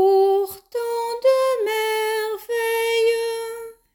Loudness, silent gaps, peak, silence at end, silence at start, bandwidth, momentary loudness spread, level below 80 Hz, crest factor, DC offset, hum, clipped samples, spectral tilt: -21 LUFS; none; -8 dBFS; 0.25 s; 0 s; 17.5 kHz; 10 LU; -66 dBFS; 12 dB; under 0.1%; none; under 0.1%; -1.5 dB/octave